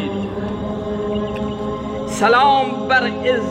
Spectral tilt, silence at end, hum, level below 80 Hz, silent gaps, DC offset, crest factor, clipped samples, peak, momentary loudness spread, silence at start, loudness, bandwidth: -5 dB/octave; 0 s; none; -42 dBFS; none; under 0.1%; 16 dB; under 0.1%; -2 dBFS; 11 LU; 0 s; -19 LUFS; 15 kHz